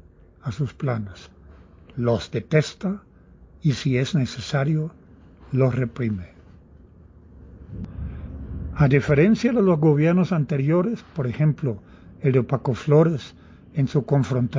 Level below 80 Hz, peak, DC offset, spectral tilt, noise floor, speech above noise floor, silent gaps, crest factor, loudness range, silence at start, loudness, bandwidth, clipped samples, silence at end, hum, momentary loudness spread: -44 dBFS; -4 dBFS; under 0.1%; -8 dB/octave; -49 dBFS; 28 dB; none; 20 dB; 8 LU; 0.45 s; -22 LUFS; 7.6 kHz; under 0.1%; 0 s; none; 17 LU